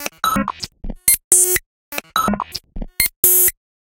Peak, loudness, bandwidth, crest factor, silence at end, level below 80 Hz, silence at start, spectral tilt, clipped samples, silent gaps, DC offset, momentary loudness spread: 0 dBFS; -15 LUFS; 17.5 kHz; 18 dB; 0.3 s; -36 dBFS; 0 s; -1.5 dB/octave; under 0.1%; 1.24-1.31 s, 1.66-1.92 s, 3.16-3.23 s; under 0.1%; 19 LU